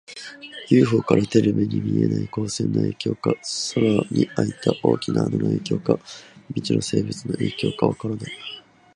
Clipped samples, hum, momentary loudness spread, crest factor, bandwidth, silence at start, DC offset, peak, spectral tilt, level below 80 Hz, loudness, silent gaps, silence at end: under 0.1%; none; 15 LU; 22 dB; 11.5 kHz; 0.1 s; under 0.1%; 0 dBFS; -6 dB/octave; -54 dBFS; -22 LUFS; none; 0.35 s